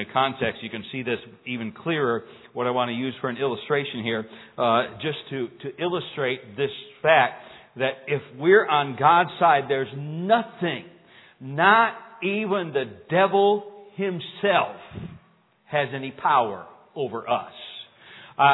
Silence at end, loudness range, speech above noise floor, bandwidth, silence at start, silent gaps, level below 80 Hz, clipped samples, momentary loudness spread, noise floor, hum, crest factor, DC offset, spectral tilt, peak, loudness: 0 s; 6 LU; 36 dB; 4.1 kHz; 0 s; none; -66 dBFS; under 0.1%; 16 LU; -60 dBFS; none; 22 dB; under 0.1%; -9 dB/octave; -2 dBFS; -24 LUFS